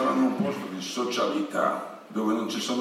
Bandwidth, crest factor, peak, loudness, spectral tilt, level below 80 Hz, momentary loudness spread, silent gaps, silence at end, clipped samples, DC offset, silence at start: 15.5 kHz; 16 dB; -12 dBFS; -28 LUFS; -4.5 dB/octave; -84 dBFS; 8 LU; none; 0 s; under 0.1%; under 0.1%; 0 s